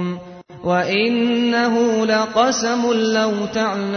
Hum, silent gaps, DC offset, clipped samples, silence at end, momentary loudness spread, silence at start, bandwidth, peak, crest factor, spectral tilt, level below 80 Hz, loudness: none; none; under 0.1%; under 0.1%; 0 s; 4 LU; 0 s; 6.6 kHz; -2 dBFS; 16 dB; -4 dB/octave; -58 dBFS; -18 LUFS